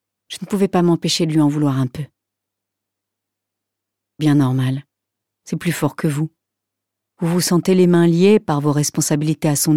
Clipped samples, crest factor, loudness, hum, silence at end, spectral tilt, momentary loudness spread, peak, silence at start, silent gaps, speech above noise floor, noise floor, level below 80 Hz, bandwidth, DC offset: under 0.1%; 16 dB; -17 LUFS; none; 0 s; -5.5 dB/octave; 13 LU; -4 dBFS; 0.3 s; none; 65 dB; -82 dBFS; -58 dBFS; 16.5 kHz; under 0.1%